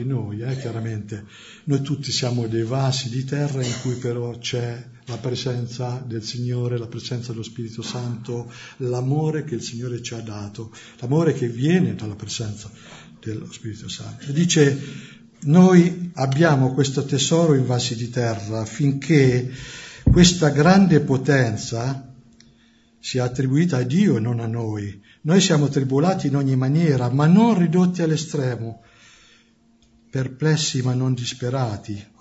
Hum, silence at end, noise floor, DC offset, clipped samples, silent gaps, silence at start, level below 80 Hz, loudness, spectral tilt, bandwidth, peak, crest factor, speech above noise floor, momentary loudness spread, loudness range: none; 0.15 s; -57 dBFS; under 0.1%; under 0.1%; none; 0 s; -42 dBFS; -21 LUFS; -6 dB/octave; 8 kHz; -2 dBFS; 20 dB; 37 dB; 16 LU; 9 LU